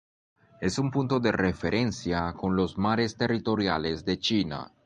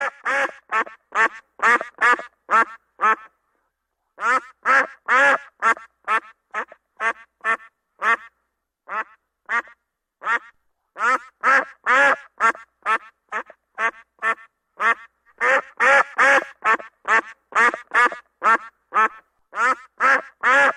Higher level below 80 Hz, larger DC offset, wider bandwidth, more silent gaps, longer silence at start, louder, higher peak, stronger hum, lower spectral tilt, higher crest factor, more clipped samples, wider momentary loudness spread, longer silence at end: first, -48 dBFS vs -72 dBFS; neither; second, 9.8 kHz vs 11.5 kHz; neither; first, 0.6 s vs 0 s; second, -27 LUFS vs -20 LUFS; second, -10 dBFS vs -6 dBFS; neither; first, -5.5 dB/octave vs -1 dB/octave; about the same, 18 dB vs 16 dB; neither; second, 4 LU vs 13 LU; first, 0.2 s vs 0 s